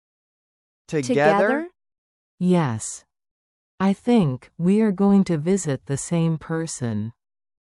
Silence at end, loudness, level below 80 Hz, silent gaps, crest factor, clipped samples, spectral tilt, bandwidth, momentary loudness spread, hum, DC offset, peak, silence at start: 0.6 s; -22 LUFS; -58 dBFS; 1.98-2.38 s, 3.31-3.78 s; 18 dB; under 0.1%; -6.5 dB/octave; 12 kHz; 11 LU; none; under 0.1%; -4 dBFS; 0.9 s